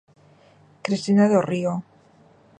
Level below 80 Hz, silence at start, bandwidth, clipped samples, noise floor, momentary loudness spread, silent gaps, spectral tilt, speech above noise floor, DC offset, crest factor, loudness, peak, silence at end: -68 dBFS; 0.85 s; 9.6 kHz; under 0.1%; -54 dBFS; 14 LU; none; -7 dB/octave; 35 dB; under 0.1%; 18 dB; -22 LUFS; -6 dBFS; 0.8 s